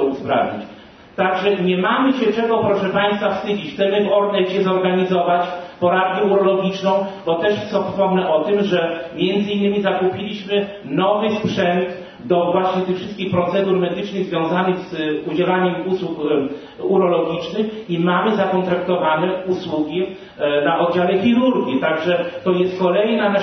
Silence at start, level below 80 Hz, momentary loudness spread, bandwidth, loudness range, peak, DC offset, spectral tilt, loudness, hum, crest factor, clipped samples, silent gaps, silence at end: 0 s; -58 dBFS; 6 LU; 6.4 kHz; 2 LU; -4 dBFS; under 0.1%; -7 dB/octave; -19 LUFS; none; 16 dB; under 0.1%; none; 0 s